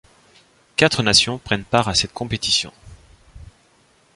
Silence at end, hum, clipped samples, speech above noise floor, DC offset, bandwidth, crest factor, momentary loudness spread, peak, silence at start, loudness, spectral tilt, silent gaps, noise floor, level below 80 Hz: 0.7 s; none; under 0.1%; 38 dB; under 0.1%; 11.5 kHz; 22 dB; 10 LU; 0 dBFS; 0.8 s; -18 LUFS; -3 dB/octave; none; -57 dBFS; -44 dBFS